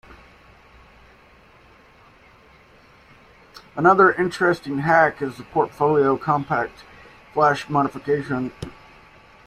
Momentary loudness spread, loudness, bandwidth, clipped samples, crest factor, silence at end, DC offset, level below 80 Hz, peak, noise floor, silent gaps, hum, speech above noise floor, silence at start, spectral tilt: 14 LU; -20 LUFS; 13 kHz; under 0.1%; 20 dB; 0.75 s; under 0.1%; -56 dBFS; -2 dBFS; -51 dBFS; none; none; 32 dB; 0.1 s; -7 dB/octave